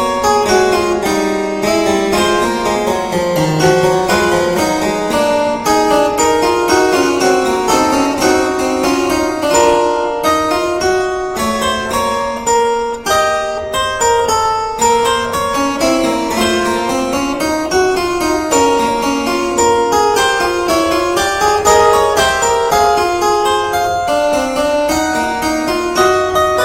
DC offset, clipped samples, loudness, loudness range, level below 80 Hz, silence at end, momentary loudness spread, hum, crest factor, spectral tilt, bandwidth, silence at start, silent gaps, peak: under 0.1%; under 0.1%; -13 LUFS; 3 LU; -38 dBFS; 0 s; 4 LU; none; 14 dB; -3.5 dB/octave; 16.5 kHz; 0 s; none; 0 dBFS